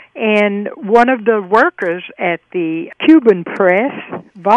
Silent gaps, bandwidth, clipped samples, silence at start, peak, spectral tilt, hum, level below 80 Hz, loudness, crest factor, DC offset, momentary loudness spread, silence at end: none; 8.4 kHz; 0.2%; 0.15 s; 0 dBFS; -7 dB/octave; none; -60 dBFS; -14 LUFS; 14 dB; under 0.1%; 11 LU; 0 s